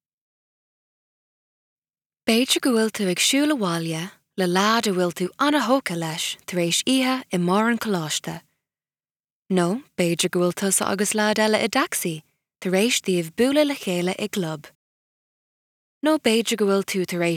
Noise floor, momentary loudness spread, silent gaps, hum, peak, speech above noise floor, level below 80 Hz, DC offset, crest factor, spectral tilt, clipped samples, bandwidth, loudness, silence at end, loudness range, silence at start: under -90 dBFS; 8 LU; 9.11-9.15 s, 9.32-9.43 s, 14.75-16.01 s; none; -6 dBFS; over 68 dB; -70 dBFS; under 0.1%; 18 dB; -3.5 dB/octave; under 0.1%; 18.5 kHz; -22 LUFS; 0 s; 3 LU; 2.25 s